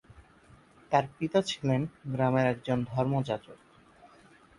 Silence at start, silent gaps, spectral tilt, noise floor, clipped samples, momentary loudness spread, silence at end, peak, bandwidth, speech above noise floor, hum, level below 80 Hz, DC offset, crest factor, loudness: 0.9 s; none; -6.5 dB/octave; -58 dBFS; under 0.1%; 6 LU; 1.05 s; -12 dBFS; 11.5 kHz; 29 dB; none; -62 dBFS; under 0.1%; 20 dB; -30 LUFS